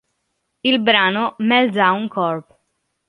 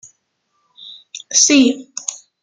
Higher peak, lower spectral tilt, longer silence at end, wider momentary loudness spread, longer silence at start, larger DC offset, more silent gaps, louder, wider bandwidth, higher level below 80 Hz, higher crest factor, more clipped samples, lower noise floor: about the same, -2 dBFS vs 0 dBFS; first, -6.5 dB/octave vs -0.5 dB/octave; first, 0.65 s vs 0.3 s; second, 8 LU vs 25 LU; second, 0.65 s vs 0.85 s; neither; neither; second, -17 LUFS vs -14 LUFS; about the same, 10.5 kHz vs 10 kHz; about the same, -68 dBFS vs -64 dBFS; about the same, 18 dB vs 18 dB; neither; first, -72 dBFS vs -68 dBFS